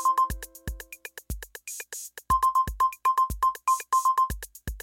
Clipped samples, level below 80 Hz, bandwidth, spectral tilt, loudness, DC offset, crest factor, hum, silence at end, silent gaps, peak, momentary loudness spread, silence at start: under 0.1%; -42 dBFS; 17 kHz; -3 dB/octave; -26 LUFS; under 0.1%; 14 dB; none; 0 s; none; -14 dBFS; 16 LU; 0 s